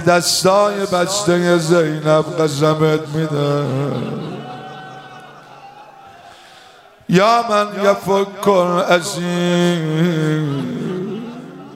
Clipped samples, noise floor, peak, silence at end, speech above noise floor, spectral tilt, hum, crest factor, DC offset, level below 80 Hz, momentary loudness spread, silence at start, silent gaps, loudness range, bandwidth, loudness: under 0.1%; -44 dBFS; 0 dBFS; 0 s; 29 dB; -5 dB/octave; none; 16 dB; under 0.1%; -60 dBFS; 17 LU; 0 s; none; 9 LU; 16 kHz; -16 LUFS